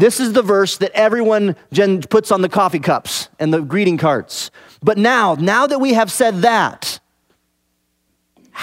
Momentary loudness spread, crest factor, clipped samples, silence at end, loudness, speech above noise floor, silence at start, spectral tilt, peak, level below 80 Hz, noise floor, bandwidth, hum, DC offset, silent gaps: 10 LU; 16 dB; under 0.1%; 0 s; -15 LUFS; 52 dB; 0 s; -4.5 dB/octave; 0 dBFS; -62 dBFS; -66 dBFS; 16 kHz; none; under 0.1%; none